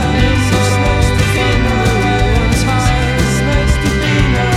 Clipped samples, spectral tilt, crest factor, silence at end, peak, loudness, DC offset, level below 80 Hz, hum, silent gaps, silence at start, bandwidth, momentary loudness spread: under 0.1%; -5.5 dB/octave; 12 dB; 0 s; 0 dBFS; -13 LUFS; under 0.1%; -18 dBFS; none; none; 0 s; 15.5 kHz; 1 LU